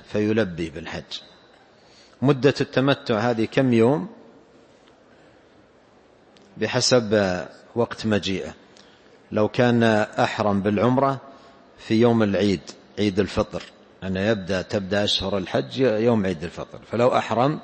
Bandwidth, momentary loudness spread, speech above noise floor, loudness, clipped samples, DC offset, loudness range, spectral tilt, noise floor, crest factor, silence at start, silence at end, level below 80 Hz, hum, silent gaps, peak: 8.8 kHz; 14 LU; 33 dB; -22 LUFS; under 0.1%; under 0.1%; 4 LU; -5.5 dB/octave; -54 dBFS; 18 dB; 0.1 s; 0 s; -54 dBFS; none; none; -4 dBFS